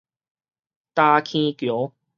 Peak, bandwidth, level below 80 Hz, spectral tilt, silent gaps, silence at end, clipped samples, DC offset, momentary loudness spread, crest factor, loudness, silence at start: -2 dBFS; 7 kHz; -74 dBFS; -6 dB/octave; none; 0.3 s; under 0.1%; under 0.1%; 10 LU; 22 dB; -21 LUFS; 0.95 s